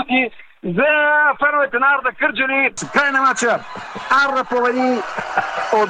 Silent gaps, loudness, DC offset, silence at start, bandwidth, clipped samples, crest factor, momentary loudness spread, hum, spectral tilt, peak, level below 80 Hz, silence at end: none; -17 LUFS; under 0.1%; 0 s; 10 kHz; under 0.1%; 16 dB; 8 LU; none; -3.5 dB/octave; -2 dBFS; -58 dBFS; 0 s